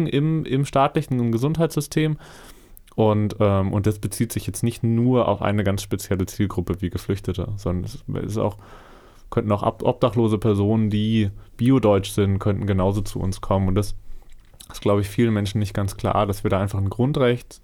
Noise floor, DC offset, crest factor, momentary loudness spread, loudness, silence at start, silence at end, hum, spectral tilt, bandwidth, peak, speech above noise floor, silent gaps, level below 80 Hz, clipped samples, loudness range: -43 dBFS; under 0.1%; 16 dB; 8 LU; -22 LUFS; 0 s; 0.05 s; none; -7 dB/octave; 17.5 kHz; -6 dBFS; 21 dB; none; -40 dBFS; under 0.1%; 5 LU